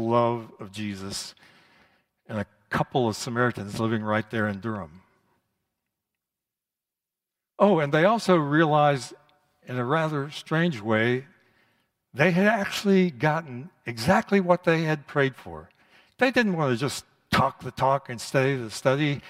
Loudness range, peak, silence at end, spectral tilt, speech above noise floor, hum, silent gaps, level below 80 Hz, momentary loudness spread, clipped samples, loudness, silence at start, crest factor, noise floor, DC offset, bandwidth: 7 LU; -4 dBFS; 0 s; -6 dB/octave; 65 dB; none; none; -60 dBFS; 14 LU; under 0.1%; -25 LUFS; 0 s; 20 dB; -89 dBFS; under 0.1%; 16 kHz